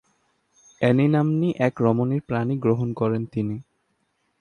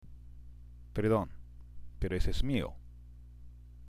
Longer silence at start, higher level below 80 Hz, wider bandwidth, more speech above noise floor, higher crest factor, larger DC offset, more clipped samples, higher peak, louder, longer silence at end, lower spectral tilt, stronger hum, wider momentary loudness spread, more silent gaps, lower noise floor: first, 0.8 s vs 0.05 s; second, -60 dBFS vs -42 dBFS; second, 9.6 kHz vs 13.5 kHz; first, 49 dB vs 21 dB; about the same, 18 dB vs 18 dB; neither; neither; first, -6 dBFS vs -16 dBFS; first, -23 LUFS vs -35 LUFS; first, 0.8 s vs 0 s; first, -9 dB/octave vs -7 dB/octave; second, none vs 60 Hz at -50 dBFS; second, 8 LU vs 24 LU; neither; first, -71 dBFS vs -51 dBFS